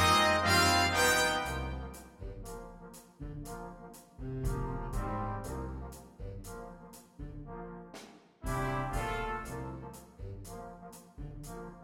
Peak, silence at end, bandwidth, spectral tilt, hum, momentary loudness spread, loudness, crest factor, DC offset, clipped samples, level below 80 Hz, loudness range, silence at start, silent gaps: -14 dBFS; 0 s; 16.5 kHz; -3.5 dB/octave; none; 23 LU; -31 LUFS; 20 dB; under 0.1%; under 0.1%; -46 dBFS; 12 LU; 0 s; none